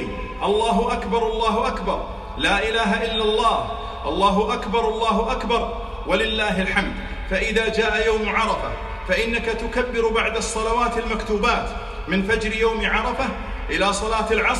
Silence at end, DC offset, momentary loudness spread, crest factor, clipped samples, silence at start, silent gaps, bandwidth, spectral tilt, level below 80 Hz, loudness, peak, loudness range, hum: 0 s; under 0.1%; 7 LU; 18 dB; under 0.1%; 0 s; none; 12 kHz; -4 dB/octave; -34 dBFS; -21 LUFS; -4 dBFS; 1 LU; none